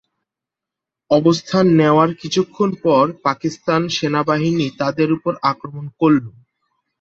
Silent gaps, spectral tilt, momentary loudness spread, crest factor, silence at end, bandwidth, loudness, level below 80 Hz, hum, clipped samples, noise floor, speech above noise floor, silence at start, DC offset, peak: none; -6.5 dB/octave; 7 LU; 16 dB; 0.7 s; 7.8 kHz; -17 LUFS; -58 dBFS; none; under 0.1%; -86 dBFS; 69 dB; 1.1 s; under 0.1%; -2 dBFS